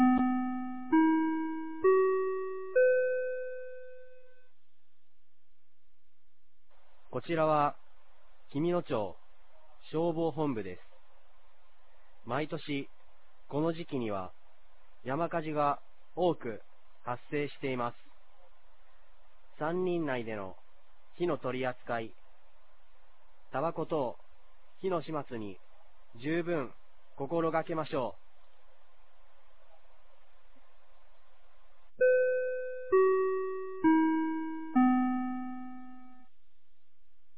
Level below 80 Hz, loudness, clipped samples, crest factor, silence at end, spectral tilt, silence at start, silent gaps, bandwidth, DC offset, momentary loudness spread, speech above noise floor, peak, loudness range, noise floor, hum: -68 dBFS; -32 LUFS; under 0.1%; 18 dB; 1.3 s; -5.5 dB/octave; 0 s; none; 4 kHz; 0.8%; 16 LU; 48 dB; -14 dBFS; 10 LU; -82 dBFS; none